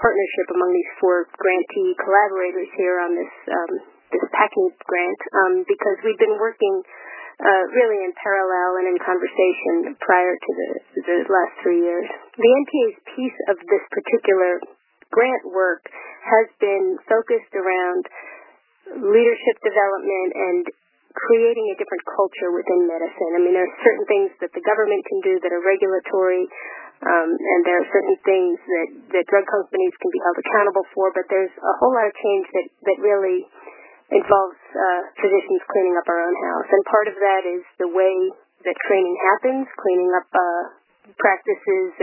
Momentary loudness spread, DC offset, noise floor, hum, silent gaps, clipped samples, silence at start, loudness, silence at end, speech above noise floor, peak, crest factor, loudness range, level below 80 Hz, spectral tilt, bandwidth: 9 LU; under 0.1%; -50 dBFS; none; none; under 0.1%; 0 s; -20 LUFS; 0 s; 30 dB; 0 dBFS; 18 dB; 2 LU; -66 dBFS; -8.5 dB/octave; 3.1 kHz